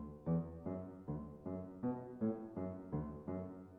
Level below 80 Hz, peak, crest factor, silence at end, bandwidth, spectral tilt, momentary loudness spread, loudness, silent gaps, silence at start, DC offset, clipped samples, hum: -62 dBFS; -28 dBFS; 16 dB; 0 s; 2.7 kHz; -12 dB/octave; 7 LU; -44 LUFS; none; 0 s; under 0.1%; under 0.1%; none